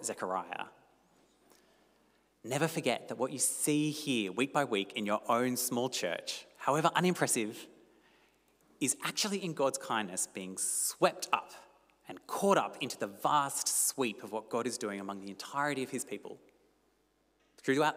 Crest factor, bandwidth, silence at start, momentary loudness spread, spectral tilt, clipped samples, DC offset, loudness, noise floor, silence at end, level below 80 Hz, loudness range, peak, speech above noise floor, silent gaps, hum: 24 dB; 16 kHz; 0 s; 12 LU; -3 dB/octave; under 0.1%; under 0.1%; -33 LUFS; -73 dBFS; 0 s; -84 dBFS; 5 LU; -12 dBFS; 40 dB; none; none